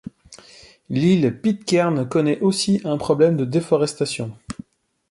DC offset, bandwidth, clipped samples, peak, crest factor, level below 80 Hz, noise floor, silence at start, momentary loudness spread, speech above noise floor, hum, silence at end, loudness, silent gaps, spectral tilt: under 0.1%; 11.5 kHz; under 0.1%; -4 dBFS; 16 dB; -56 dBFS; -48 dBFS; 0.3 s; 14 LU; 29 dB; none; 0.6 s; -20 LUFS; none; -6 dB/octave